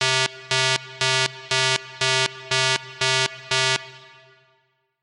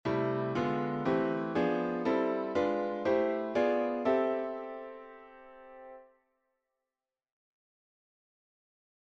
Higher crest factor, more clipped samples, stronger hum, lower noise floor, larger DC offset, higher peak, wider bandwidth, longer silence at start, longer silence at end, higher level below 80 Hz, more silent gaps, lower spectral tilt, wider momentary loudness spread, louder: about the same, 22 dB vs 18 dB; neither; neither; second, -67 dBFS vs under -90 dBFS; neither; first, -2 dBFS vs -16 dBFS; first, 12 kHz vs 7.6 kHz; about the same, 0 s vs 0.05 s; second, 1.05 s vs 3.05 s; about the same, -64 dBFS vs -68 dBFS; neither; second, -1.5 dB/octave vs -7.5 dB/octave; second, 2 LU vs 21 LU; first, -21 LUFS vs -31 LUFS